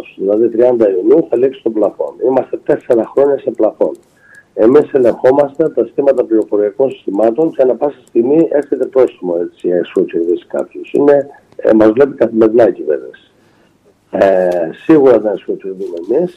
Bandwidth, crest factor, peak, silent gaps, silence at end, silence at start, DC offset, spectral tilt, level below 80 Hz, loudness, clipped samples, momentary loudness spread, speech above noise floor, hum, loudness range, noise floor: 8.2 kHz; 12 dB; 0 dBFS; none; 0.05 s; 0.2 s; under 0.1%; -8.5 dB/octave; -56 dBFS; -12 LUFS; under 0.1%; 9 LU; 39 dB; none; 2 LU; -51 dBFS